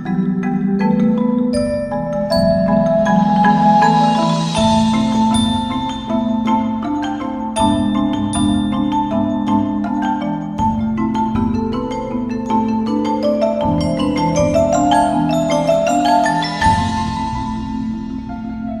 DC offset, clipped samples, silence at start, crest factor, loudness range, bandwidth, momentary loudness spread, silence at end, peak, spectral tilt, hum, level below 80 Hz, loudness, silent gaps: under 0.1%; under 0.1%; 0 s; 14 dB; 4 LU; 11 kHz; 8 LU; 0 s; -2 dBFS; -6 dB/octave; none; -36 dBFS; -16 LUFS; none